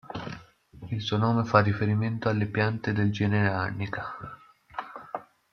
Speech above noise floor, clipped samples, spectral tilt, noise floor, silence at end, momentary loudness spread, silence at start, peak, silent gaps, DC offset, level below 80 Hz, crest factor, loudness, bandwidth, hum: 23 dB; under 0.1%; -7.5 dB/octave; -49 dBFS; 0.3 s; 18 LU; 0.05 s; -4 dBFS; none; under 0.1%; -60 dBFS; 22 dB; -27 LUFS; 6.6 kHz; none